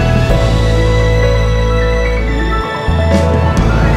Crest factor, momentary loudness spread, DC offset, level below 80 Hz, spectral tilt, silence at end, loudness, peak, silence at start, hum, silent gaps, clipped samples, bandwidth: 10 dB; 4 LU; under 0.1%; -14 dBFS; -6.5 dB/octave; 0 s; -13 LUFS; 0 dBFS; 0 s; none; none; under 0.1%; 10.5 kHz